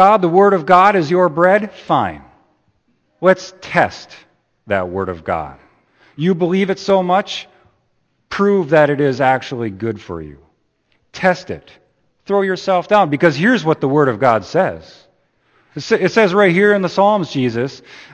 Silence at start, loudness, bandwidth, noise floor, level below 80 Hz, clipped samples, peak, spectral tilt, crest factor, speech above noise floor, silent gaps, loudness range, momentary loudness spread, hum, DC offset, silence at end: 0 s; -15 LUFS; 8.6 kHz; -64 dBFS; -54 dBFS; under 0.1%; 0 dBFS; -6.5 dB/octave; 16 dB; 49 dB; none; 5 LU; 15 LU; none; under 0.1%; 0.15 s